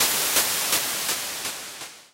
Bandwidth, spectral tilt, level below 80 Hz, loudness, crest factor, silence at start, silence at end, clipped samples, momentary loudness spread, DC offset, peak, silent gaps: 16 kHz; 1 dB/octave; -62 dBFS; -22 LUFS; 18 dB; 0 s; 0.1 s; under 0.1%; 15 LU; under 0.1%; -8 dBFS; none